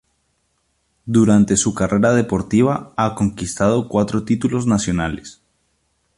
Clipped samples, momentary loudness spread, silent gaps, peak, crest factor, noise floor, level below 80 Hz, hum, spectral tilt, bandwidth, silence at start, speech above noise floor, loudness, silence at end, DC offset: under 0.1%; 8 LU; none; -2 dBFS; 16 dB; -67 dBFS; -42 dBFS; none; -6 dB/octave; 11.5 kHz; 1.05 s; 50 dB; -18 LUFS; 0.85 s; under 0.1%